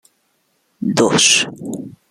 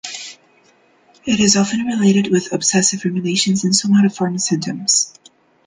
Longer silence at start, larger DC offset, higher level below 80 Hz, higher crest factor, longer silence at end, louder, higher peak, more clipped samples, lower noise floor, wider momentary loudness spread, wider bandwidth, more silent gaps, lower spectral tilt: first, 0.8 s vs 0.05 s; neither; about the same, -60 dBFS vs -56 dBFS; about the same, 18 dB vs 18 dB; second, 0.2 s vs 0.55 s; about the same, -14 LUFS vs -16 LUFS; about the same, 0 dBFS vs 0 dBFS; neither; first, -64 dBFS vs -54 dBFS; first, 18 LU vs 9 LU; first, 15 kHz vs 10 kHz; neither; second, -2 dB/octave vs -3.5 dB/octave